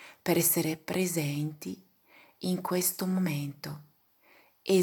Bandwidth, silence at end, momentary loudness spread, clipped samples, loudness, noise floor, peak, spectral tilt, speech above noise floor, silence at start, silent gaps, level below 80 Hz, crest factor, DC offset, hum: 19 kHz; 0 s; 17 LU; under 0.1%; -30 LUFS; -64 dBFS; -12 dBFS; -4.5 dB/octave; 33 dB; 0 s; none; -74 dBFS; 20 dB; under 0.1%; none